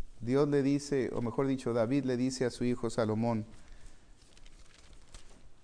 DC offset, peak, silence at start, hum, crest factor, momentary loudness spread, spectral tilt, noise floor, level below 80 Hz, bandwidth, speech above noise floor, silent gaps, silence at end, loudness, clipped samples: under 0.1%; -16 dBFS; 0 s; none; 16 dB; 5 LU; -6.5 dB/octave; -54 dBFS; -54 dBFS; 10.5 kHz; 23 dB; none; 0.05 s; -32 LUFS; under 0.1%